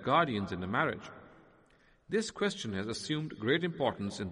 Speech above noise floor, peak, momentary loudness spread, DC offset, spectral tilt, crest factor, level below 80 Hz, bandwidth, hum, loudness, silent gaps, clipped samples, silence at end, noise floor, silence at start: 32 dB; -16 dBFS; 8 LU; under 0.1%; -5 dB/octave; 18 dB; -66 dBFS; 11 kHz; none; -33 LUFS; none; under 0.1%; 0 s; -65 dBFS; 0 s